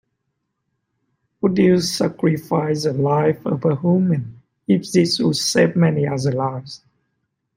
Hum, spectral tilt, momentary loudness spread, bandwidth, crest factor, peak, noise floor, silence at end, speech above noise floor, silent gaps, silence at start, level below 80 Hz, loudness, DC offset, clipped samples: none; -6 dB/octave; 9 LU; 16.5 kHz; 18 dB; -2 dBFS; -75 dBFS; 0.8 s; 57 dB; none; 1.45 s; -60 dBFS; -19 LUFS; under 0.1%; under 0.1%